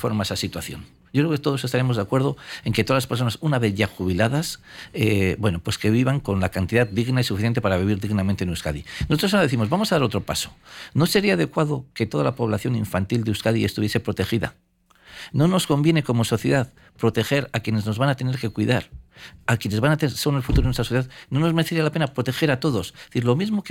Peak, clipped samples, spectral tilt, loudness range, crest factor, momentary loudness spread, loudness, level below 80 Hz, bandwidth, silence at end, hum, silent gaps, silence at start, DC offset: -6 dBFS; under 0.1%; -6 dB/octave; 2 LU; 16 dB; 7 LU; -22 LUFS; -40 dBFS; 17 kHz; 0 s; none; none; 0 s; under 0.1%